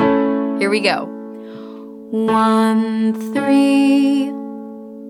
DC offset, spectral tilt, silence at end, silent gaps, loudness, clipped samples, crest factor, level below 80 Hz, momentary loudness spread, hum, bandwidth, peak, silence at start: under 0.1%; -5.5 dB/octave; 0 s; none; -16 LUFS; under 0.1%; 16 dB; -62 dBFS; 20 LU; none; 12.5 kHz; 0 dBFS; 0 s